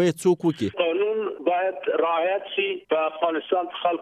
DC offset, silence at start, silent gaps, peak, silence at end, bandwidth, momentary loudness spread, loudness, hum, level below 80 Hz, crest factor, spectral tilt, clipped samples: under 0.1%; 0 s; none; -8 dBFS; 0 s; 13.5 kHz; 4 LU; -24 LUFS; none; -70 dBFS; 14 dB; -5.5 dB/octave; under 0.1%